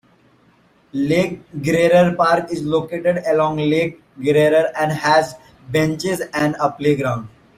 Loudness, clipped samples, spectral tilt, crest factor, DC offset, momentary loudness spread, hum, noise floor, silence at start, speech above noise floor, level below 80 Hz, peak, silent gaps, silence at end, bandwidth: -18 LUFS; under 0.1%; -6 dB/octave; 16 dB; under 0.1%; 10 LU; none; -55 dBFS; 0.95 s; 37 dB; -54 dBFS; -2 dBFS; none; 0.3 s; 15.5 kHz